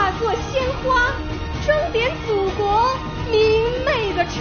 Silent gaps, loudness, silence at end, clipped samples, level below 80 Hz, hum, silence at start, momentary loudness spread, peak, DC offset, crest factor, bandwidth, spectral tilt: none; -20 LUFS; 0 s; under 0.1%; -32 dBFS; none; 0 s; 5 LU; -4 dBFS; under 0.1%; 16 dB; 6.6 kHz; -3 dB/octave